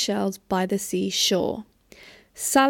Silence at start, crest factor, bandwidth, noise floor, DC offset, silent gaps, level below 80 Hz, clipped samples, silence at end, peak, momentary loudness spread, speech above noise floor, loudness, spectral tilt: 0 s; 20 dB; 18 kHz; -50 dBFS; under 0.1%; none; -60 dBFS; under 0.1%; 0 s; -4 dBFS; 10 LU; 27 dB; -24 LUFS; -3 dB/octave